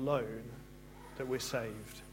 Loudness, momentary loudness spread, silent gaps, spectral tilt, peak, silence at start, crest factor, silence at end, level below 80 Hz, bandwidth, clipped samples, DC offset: -39 LUFS; 17 LU; none; -5 dB/octave; -20 dBFS; 0 s; 20 dB; 0 s; -58 dBFS; 16.5 kHz; under 0.1%; under 0.1%